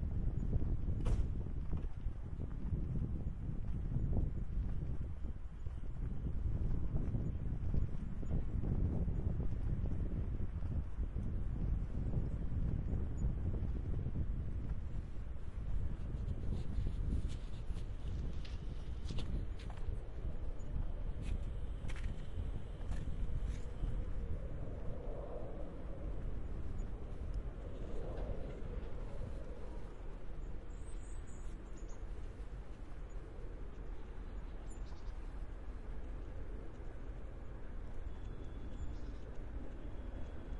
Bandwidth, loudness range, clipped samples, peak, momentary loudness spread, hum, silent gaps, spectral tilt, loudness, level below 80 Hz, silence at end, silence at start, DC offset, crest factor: 10 kHz; 10 LU; under 0.1%; -22 dBFS; 11 LU; none; none; -8.5 dB/octave; -44 LUFS; -42 dBFS; 0 s; 0 s; under 0.1%; 16 dB